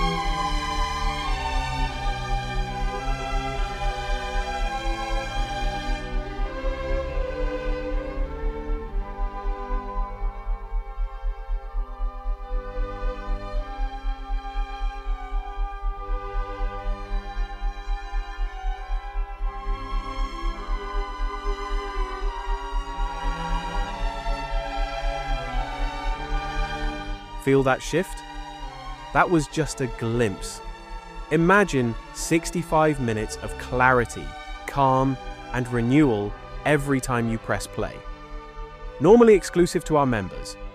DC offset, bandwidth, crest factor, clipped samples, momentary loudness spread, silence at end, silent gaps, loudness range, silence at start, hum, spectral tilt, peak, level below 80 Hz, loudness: under 0.1%; 14 kHz; 20 dB; under 0.1%; 14 LU; 0 s; none; 11 LU; 0 s; none; -5.5 dB/octave; -4 dBFS; -30 dBFS; -26 LUFS